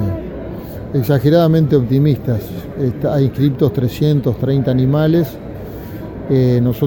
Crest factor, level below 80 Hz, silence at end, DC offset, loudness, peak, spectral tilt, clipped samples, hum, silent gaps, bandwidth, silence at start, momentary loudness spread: 14 dB; -38 dBFS; 0 s; under 0.1%; -15 LUFS; -2 dBFS; -9 dB/octave; under 0.1%; none; none; 17.5 kHz; 0 s; 16 LU